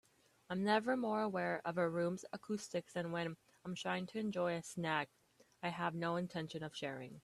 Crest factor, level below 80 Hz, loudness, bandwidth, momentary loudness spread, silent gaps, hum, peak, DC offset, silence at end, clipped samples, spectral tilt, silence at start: 20 dB; -80 dBFS; -40 LUFS; 13.5 kHz; 10 LU; none; none; -20 dBFS; under 0.1%; 0.05 s; under 0.1%; -5.5 dB/octave; 0.5 s